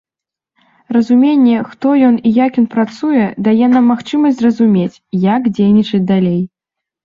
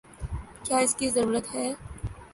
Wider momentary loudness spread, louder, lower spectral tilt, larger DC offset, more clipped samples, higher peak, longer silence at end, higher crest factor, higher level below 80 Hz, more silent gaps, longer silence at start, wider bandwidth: second, 6 LU vs 14 LU; first, -12 LUFS vs -27 LUFS; first, -8.5 dB/octave vs -3.5 dB/octave; neither; neither; first, -2 dBFS vs -12 dBFS; first, 0.55 s vs 0.05 s; second, 12 dB vs 18 dB; second, -54 dBFS vs -44 dBFS; neither; first, 0.9 s vs 0.1 s; second, 7.2 kHz vs 12 kHz